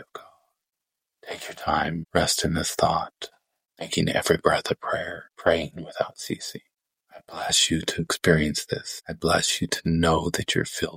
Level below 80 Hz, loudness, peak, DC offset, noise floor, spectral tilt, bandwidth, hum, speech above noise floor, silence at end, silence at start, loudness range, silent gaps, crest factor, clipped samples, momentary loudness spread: -46 dBFS; -24 LUFS; -2 dBFS; under 0.1%; -86 dBFS; -3.5 dB/octave; 16.5 kHz; none; 61 dB; 0 s; 0 s; 3 LU; none; 24 dB; under 0.1%; 15 LU